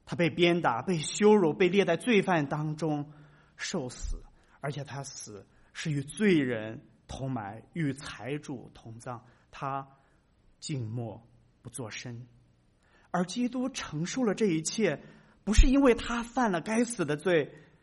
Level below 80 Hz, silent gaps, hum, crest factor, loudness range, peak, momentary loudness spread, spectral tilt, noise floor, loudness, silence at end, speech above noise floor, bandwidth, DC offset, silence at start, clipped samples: -40 dBFS; none; none; 22 dB; 13 LU; -8 dBFS; 18 LU; -5.5 dB/octave; -65 dBFS; -30 LUFS; 0.25 s; 36 dB; 11.5 kHz; under 0.1%; 0.05 s; under 0.1%